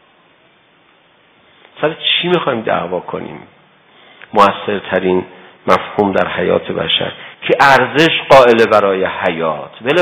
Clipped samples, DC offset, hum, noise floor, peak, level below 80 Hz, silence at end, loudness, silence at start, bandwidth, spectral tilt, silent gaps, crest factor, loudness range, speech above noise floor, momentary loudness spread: 0.7%; under 0.1%; none; -51 dBFS; 0 dBFS; -50 dBFS; 0 s; -13 LUFS; 1.75 s; 16.5 kHz; -5 dB/octave; none; 14 dB; 7 LU; 38 dB; 13 LU